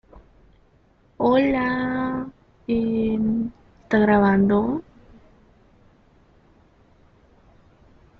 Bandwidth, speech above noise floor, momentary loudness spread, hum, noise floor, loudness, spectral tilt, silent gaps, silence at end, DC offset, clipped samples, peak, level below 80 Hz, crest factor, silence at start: 5.6 kHz; 39 dB; 14 LU; none; -58 dBFS; -21 LUFS; -9 dB/octave; none; 3.4 s; under 0.1%; under 0.1%; -6 dBFS; -50 dBFS; 18 dB; 0.15 s